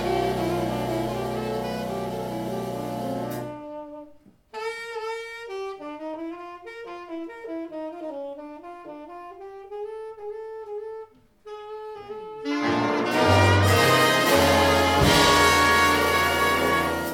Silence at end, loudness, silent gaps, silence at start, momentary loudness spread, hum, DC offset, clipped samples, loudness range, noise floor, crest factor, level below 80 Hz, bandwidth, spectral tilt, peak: 0 s; -22 LUFS; none; 0 s; 21 LU; none; under 0.1%; under 0.1%; 19 LU; -52 dBFS; 20 dB; -46 dBFS; 18 kHz; -4 dB/octave; -4 dBFS